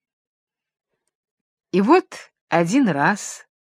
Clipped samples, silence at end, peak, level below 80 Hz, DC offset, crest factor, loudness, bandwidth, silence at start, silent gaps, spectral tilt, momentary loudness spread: under 0.1%; 0.4 s; -2 dBFS; -72 dBFS; under 0.1%; 20 dB; -19 LUFS; 13.5 kHz; 1.75 s; 2.41-2.48 s; -5.5 dB/octave; 22 LU